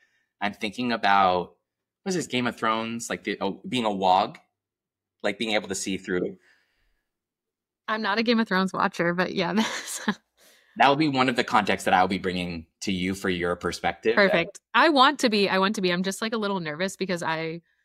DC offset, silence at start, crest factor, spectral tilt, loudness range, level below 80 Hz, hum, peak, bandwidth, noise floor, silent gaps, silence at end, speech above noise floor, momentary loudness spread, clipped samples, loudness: under 0.1%; 0.4 s; 20 dB; -4 dB/octave; 6 LU; -62 dBFS; none; -6 dBFS; 15.5 kHz; -89 dBFS; none; 0.25 s; 64 dB; 11 LU; under 0.1%; -25 LUFS